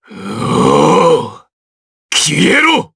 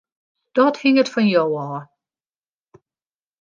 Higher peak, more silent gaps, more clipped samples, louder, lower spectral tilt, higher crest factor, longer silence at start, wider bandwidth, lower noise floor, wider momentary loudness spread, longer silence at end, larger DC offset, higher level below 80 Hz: first, 0 dBFS vs -4 dBFS; first, 1.53-2.09 s vs none; neither; first, -10 LUFS vs -18 LUFS; second, -3.5 dB/octave vs -6 dB/octave; second, 12 dB vs 18 dB; second, 0.1 s vs 0.55 s; first, 11 kHz vs 7.4 kHz; about the same, under -90 dBFS vs under -90 dBFS; about the same, 12 LU vs 12 LU; second, 0.1 s vs 1.6 s; neither; first, -46 dBFS vs -74 dBFS